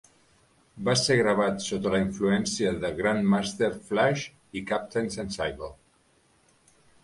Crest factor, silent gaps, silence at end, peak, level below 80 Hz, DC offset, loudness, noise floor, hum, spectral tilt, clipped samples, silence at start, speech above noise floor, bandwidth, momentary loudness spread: 18 dB; none; 1.3 s; -8 dBFS; -54 dBFS; under 0.1%; -27 LUFS; -64 dBFS; none; -4.5 dB/octave; under 0.1%; 0.75 s; 38 dB; 11.5 kHz; 10 LU